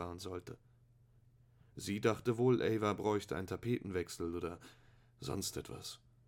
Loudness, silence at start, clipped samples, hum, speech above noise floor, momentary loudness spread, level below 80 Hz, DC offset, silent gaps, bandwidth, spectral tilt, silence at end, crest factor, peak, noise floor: -38 LUFS; 0 s; under 0.1%; none; 29 dB; 16 LU; -66 dBFS; under 0.1%; none; 17.5 kHz; -5.5 dB/octave; 0.3 s; 22 dB; -18 dBFS; -67 dBFS